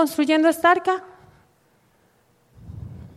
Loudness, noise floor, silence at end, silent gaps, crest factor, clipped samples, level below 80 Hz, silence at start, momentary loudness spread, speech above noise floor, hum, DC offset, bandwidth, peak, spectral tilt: -19 LUFS; -61 dBFS; 0.1 s; none; 18 dB; under 0.1%; -54 dBFS; 0 s; 22 LU; 42 dB; none; under 0.1%; 15 kHz; -4 dBFS; -4.5 dB/octave